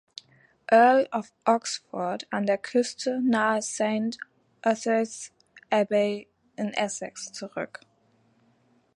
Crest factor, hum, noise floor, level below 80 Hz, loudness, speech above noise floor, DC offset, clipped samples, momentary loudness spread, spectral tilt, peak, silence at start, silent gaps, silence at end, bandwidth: 20 dB; none; -65 dBFS; -76 dBFS; -26 LUFS; 40 dB; under 0.1%; under 0.1%; 18 LU; -4 dB/octave; -6 dBFS; 0.7 s; none; 1.3 s; 11.5 kHz